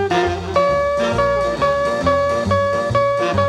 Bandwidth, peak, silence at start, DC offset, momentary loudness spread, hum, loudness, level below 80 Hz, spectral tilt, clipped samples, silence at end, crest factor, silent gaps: 11 kHz; -4 dBFS; 0 s; under 0.1%; 1 LU; none; -17 LUFS; -38 dBFS; -6 dB/octave; under 0.1%; 0 s; 12 dB; none